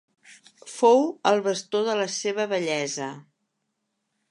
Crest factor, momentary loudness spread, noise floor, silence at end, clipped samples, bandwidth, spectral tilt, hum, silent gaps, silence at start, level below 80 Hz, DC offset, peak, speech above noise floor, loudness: 18 dB; 12 LU; -78 dBFS; 1.1 s; under 0.1%; 11 kHz; -3.5 dB/octave; none; none; 0.3 s; -82 dBFS; under 0.1%; -6 dBFS; 55 dB; -24 LUFS